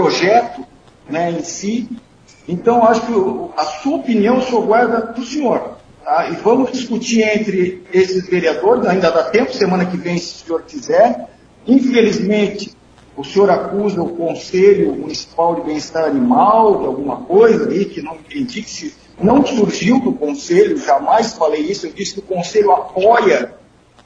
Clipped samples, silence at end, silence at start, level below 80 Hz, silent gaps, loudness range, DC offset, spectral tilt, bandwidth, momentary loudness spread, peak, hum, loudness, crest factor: under 0.1%; 0.5 s; 0 s; -52 dBFS; none; 2 LU; under 0.1%; -5.5 dB/octave; 8 kHz; 12 LU; 0 dBFS; none; -15 LUFS; 14 dB